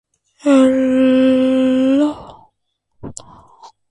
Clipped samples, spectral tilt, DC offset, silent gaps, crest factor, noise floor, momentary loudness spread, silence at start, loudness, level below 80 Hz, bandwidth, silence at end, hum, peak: under 0.1%; -5.5 dB/octave; under 0.1%; none; 14 dB; -69 dBFS; 22 LU; 0.45 s; -14 LUFS; -52 dBFS; 10.5 kHz; 0.25 s; none; -2 dBFS